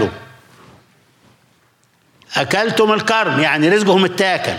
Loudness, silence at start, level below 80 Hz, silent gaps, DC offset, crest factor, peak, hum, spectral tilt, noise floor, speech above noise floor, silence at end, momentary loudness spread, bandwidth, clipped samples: -15 LUFS; 0 s; -60 dBFS; none; under 0.1%; 14 dB; -2 dBFS; none; -4.5 dB/octave; -57 dBFS; 42 dB; 0 s; 9 LU; 16 kHz; under 0.1%